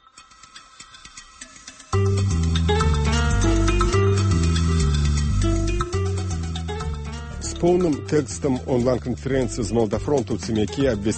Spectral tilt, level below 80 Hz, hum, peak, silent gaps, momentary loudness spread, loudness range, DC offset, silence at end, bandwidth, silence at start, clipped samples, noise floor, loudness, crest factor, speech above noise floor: -6 dB/octave; -28 dBFS; none; -8 dBFS; none; 18 LU; 4 LU; under 0.1%; 0 s; 8.8 kHz; 0.15 s; under 0.1%; -48 dBFS; -22 LUFS; 14 dB; 27 dB